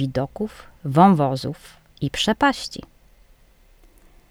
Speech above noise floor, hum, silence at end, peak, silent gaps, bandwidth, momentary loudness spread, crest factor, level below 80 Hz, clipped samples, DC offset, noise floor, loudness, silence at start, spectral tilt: 33 dB; none; 1.55 s; 0 dBFS; none; 15.5 kHz; 18 LU; 22 dB; -48 dBFS; under 0.1%; under 0.1%; -53 dBFS; -21 LUFS; 0 s; -6 dB/octave